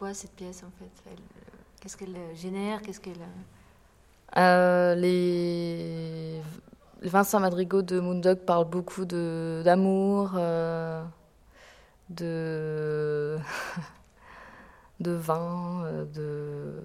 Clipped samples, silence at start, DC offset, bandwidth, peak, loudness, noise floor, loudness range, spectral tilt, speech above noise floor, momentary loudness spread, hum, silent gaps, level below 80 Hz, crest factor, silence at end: under 0.1%; 0 s; under 0.1%; 15.5 kHz; -6 dBFS; -28 LUFS; -59 dBFS; 11 LU; -6.5 dB/octave; 31 dB; 21 LU; none; none; -62 dBFS; 22 dB; 0 s